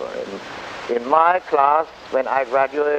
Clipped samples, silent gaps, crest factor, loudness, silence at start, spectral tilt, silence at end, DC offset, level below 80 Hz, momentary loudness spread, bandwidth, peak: under 0.1%; none; 18 dB; -19 LUFS; 0 s; -4.5 dB/octave; 0 s; under 0.1%; -60 dBFS; 15 LU; 9 kHz; -2 dBFS